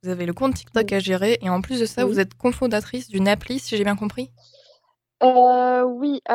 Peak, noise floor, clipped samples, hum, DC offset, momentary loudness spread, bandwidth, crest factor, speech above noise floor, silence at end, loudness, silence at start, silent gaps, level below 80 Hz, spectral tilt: -4 dBFS; -61 dBFS; under 0.1%; none; under 0.1%; 11 LU; 16 kHz; 18 dB; 40 dB; 0 s; -21 LUFS; 0.05 s; none; -48 dBFS; -5.5 dB/octave